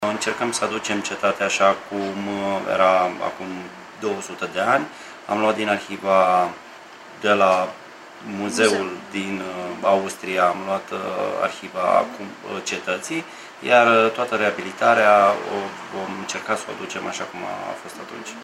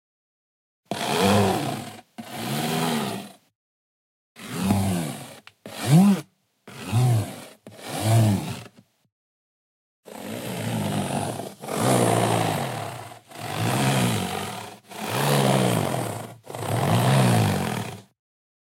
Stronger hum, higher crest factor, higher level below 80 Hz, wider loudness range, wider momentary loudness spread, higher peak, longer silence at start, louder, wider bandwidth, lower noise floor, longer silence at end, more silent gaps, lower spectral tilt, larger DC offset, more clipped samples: neither; about the same, 20 dB vs 18 dB; second, -68 dBFS vs -58 dBFS; about the same, 5 LU vs 6 LU; second, 16 LU vs 19 LU; first, -2 dBFS vs -6 dBFS; second, 0 s vs 0.9 s; first, -21 LUFS vs -24 LUFS; about the same, 15 kHz vs 16 kHz; second, -42 dBFS vs -51 dBFS; second, 0 s vs 0.65 s; second, none vs 3.55-4.35 s, 9.12-10.03 s; second, -3.5 dB/octave vs -5.5 dB/octave; neither; neither